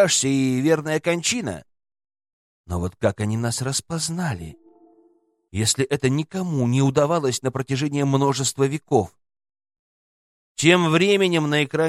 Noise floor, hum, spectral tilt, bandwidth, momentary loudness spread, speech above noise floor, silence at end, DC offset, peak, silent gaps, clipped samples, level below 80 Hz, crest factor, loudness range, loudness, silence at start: -62 dBFS; none; -4.5 dB/octave; 15 kHz; 11 LU; 41 dB; 0 s; under 0.1%; -2 dBFS; 2.33-2.64 s, 9.79-10.55 s; under 0.1%; -52 dBFS; 20 dB; 6 LU; -21 LUFS; 0 s